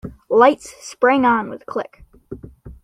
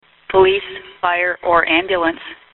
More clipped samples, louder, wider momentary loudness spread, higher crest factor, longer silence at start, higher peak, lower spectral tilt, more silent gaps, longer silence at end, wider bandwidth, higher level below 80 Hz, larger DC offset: neither; about the same, -17 LUFS vs -16 LUFS; first, 23 LU vs 9 LU; about the same, 18 dB vs 16 dB; second, 0.05 s vs 0.3 s; about the same, -2 dBFS vs -2 dBFS; first, -5 dB/octave vs -1 dB/octave; neither; about the same, 0.1 s vs 0.2 s; first, 13 kHz vs 4.2 kHz; about the same, -48 dBFS vs -48 dBFS; neither